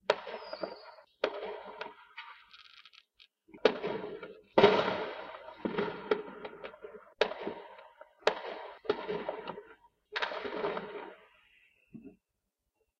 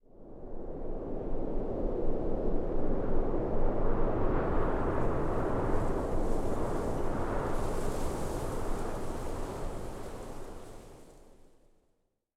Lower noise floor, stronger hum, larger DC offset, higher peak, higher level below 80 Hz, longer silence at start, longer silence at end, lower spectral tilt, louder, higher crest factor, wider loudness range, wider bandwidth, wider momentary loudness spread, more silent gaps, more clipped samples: first, -85 dBFS vs -75 dBFS; neither; neither; first, -8 dBFS vs -16 dBFS; second, -72 dBFS vs -34 dBFS; about the same, 0.1 s vs 0.2 s; second, 0.85 s vs 1.2 s; second, -5 dB/octave vs -7.5 dB/octave; about the same, -34 LUFS vs -35 LUFS; first, 28 dB vs 14 dB; about the same, 9 LU vs 8 LU; second, 8.2 kHz vs 11.5 kHz; first, 22 LU vs 13 LU; neither; neither